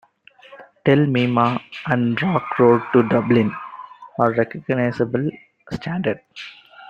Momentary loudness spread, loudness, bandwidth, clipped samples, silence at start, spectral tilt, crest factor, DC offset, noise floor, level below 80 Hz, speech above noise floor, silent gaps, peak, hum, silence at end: 17 LU; -19 LUFS; 7.2 kHz; under 0.1%; 0.5 s; -8.5 dB/octave; 18 dB; under 0.1%; -49 dBFS; -56 dBFS; 31 dB; none; -2 dBFS; none; 0.05 s